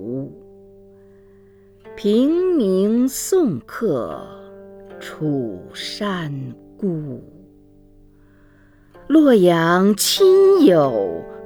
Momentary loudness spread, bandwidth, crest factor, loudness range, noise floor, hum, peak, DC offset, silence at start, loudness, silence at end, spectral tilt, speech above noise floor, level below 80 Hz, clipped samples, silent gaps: 20 LU; 20 kHz; 18 dB; 12 LU; -50 dBFS; none; -2 dBFS; under 0.1%; 0 s; -17 LUFS; 0 s; -5 dB/octave; 34 dB; -54 dBFS; under 0.1%; none